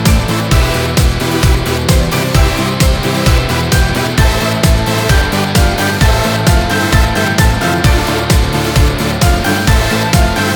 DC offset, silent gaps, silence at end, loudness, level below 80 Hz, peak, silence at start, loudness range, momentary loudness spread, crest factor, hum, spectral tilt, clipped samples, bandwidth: under 0.1%; none; 0 s; -12 LUFS; -16 dBFS; 0 dBFS; 0 s; 1 LU; 1 LU; 10 dB; none; -4.5 dB/octave; under 0.1%; over 20 kHz